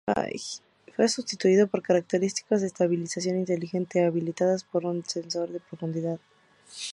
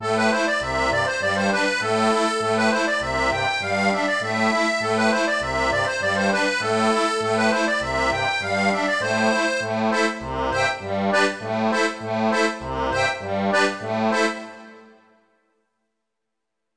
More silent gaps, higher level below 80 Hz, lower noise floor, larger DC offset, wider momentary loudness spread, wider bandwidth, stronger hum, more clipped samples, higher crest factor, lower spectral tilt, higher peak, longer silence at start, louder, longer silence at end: neither; second, -70 dBFS vs -46 dBFS; second, -49 dBFS vs -82 dBFS; second, under 0.1% vs 0.2%; first, 12 LU vs 4 LU; about the same, 11.5 kHz vs 10.5 kHz; neither; neither; about the same, 18 dB vs 16 dB; about the same, -5 dB/octave vs -4 dB/octave; second, -10 dBFS vs -6 dBFS; about the same, 0.05 s vs 0 s; second, -27 LUFS vs -21 LUFS; second, 0 s vs 1.9 s